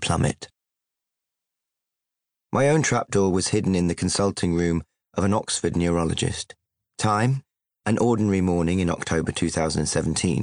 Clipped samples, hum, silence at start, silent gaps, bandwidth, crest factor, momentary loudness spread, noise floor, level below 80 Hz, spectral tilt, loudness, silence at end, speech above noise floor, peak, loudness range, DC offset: under 0.1%; none; 0 s; none; 10.5 kHz; 14 dB; 8 LU; -84 dBFS; -48 dBFS; -5 dB/octave; -23 LUFS; 0 s; 62 dB; -8 dBFS; 2 LU; under 0.1%